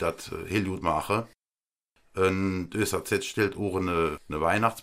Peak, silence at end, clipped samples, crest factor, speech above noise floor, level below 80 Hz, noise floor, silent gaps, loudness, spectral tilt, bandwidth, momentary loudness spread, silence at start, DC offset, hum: -8 dBFS; 0 s; under 0.1%; 20 dB; over 62 dB; -52 dBFS; under -90 dBFS; none; -28 LUFS; -5 dB/octave; 16 kHz; 5 LU; 0 s; under 0.1%; none